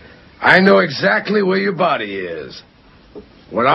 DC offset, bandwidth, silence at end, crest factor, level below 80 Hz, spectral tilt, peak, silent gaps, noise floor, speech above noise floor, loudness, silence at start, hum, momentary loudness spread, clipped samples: under 0.1%; 7.8 kHz; 0 s; 16 dB; -54 dBFS; -7 dB/octave; 0 dBFS; none; -41 dBFS; 26 dB; -15 LUFS; 0.4 s; none; 16 LU; under 0.1%